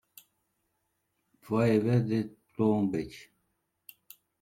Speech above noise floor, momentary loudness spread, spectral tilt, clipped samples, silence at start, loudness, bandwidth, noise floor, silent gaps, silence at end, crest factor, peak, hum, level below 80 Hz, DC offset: 52 dB; 18 LU; -8.5 dB/octave; under 0.1%; 1.45 s; -29 LUFS; 16 kHz; -79 dBFS; none; 1.2 s; 18 dB; -14 dBFS; none; -66 dBFS; under 0.1%